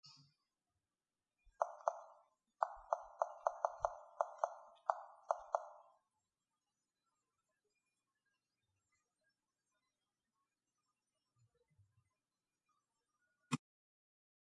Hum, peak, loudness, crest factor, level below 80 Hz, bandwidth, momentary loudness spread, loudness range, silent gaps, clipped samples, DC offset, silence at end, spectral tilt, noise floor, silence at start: none; -16 dBFS; -44 LUFS; 32 dB; -80 dBFS; 9.4 kHz; 7 LU; 11 LU; none; under 0.1%; under 0.1%; 1 s; -5 dB/octave; under -90 dBFS; 0.05 s